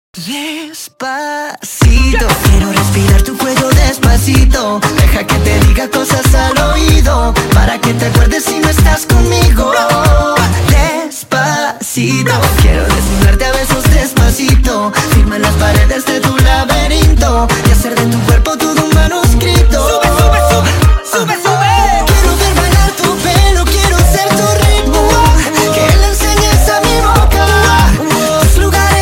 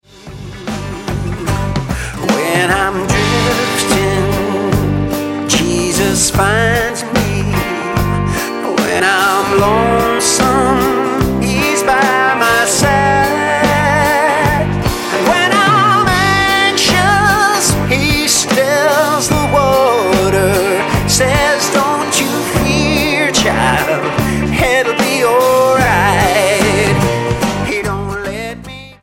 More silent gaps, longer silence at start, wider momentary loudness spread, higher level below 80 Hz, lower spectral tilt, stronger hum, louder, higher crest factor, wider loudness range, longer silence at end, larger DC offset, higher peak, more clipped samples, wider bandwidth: neither; about the same, 0.15 s vs 0.15 s; second, 4 LU vs 7 LU; first, -12 dBFS vs -28 dBFS; about the same, -4.5 dB/octave vs -4 dB/octave; neither; about the same, -10 LUFS vs -12 LUFS; about the same, 8 dB vs 12 dB; about the same, 2 LU vs 3 LU; about the same, 0 s vs 0.1 s; neither; about the same, 0 dBFS vs 0 dBFS; neither; about the same, 17 kHz vs 17 kHz